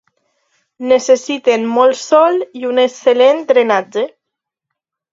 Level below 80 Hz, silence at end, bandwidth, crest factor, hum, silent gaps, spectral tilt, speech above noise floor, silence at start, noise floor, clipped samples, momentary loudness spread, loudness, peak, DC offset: -66 dBFS; 1.05 s; 7.8 kHz; 14 dB; none; none; -3 dB/octave; 67 dB; 0.8 s; -80 dBFS; under 0.1%; 9 LU; -13 LUFS; 0 dBFS; under 0.1%